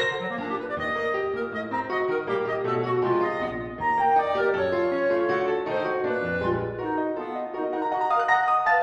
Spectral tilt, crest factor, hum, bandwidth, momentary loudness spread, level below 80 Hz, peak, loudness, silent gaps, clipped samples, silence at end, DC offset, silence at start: -6.5 dB/octave; 16 dB; none; 8.2 kHz; 8 LU; -56 dBFS; -10 dBFS; -25 LUFS; none; under 0.1%; 0 s; under 0.1%; 0 s